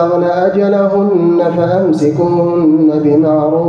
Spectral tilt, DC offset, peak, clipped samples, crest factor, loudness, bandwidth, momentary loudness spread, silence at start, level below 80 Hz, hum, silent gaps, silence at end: -9 dB/octave; under 0.1%; -2 dBFS; under 0.1%; 8 dB; -11 LUFS; 7.4 kHz; 2 LU; 0 s; -52 dBFS; none; none; 0 s